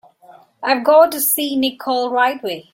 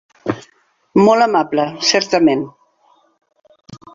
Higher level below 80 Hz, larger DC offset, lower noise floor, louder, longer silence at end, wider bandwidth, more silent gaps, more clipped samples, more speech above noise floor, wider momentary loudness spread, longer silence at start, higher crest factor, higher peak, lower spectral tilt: second, -66 dBFS vs -58 dBFS; neither; second, -47 dBFS vs -56 dBFS; about the same, -16 LUFS vs -15 LUFS; about the same, 0.1 s vs 0.2 s; first, 16.5 kHz vs 7.6 kHz; neither; neither; second, 31 dB vs 42 dB; second, 9 LU vs 14 LU; first, 0.6 s vs 0.25 s; about the same, 16 dB vs 16 dB; about the same, -2 dBFS vs 0 dBFS; second, -1.5 dB/octave vs -4 dB/octave